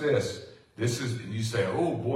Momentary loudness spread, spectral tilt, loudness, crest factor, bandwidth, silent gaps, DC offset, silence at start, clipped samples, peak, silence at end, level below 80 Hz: 10 LU; -5.5 dB/octave; -30 LUFS; 14 dB; 15 kHz; none; under 0.1%; 0 s; under 0.1%; -14 dBFS; 0 s; -64 dBFS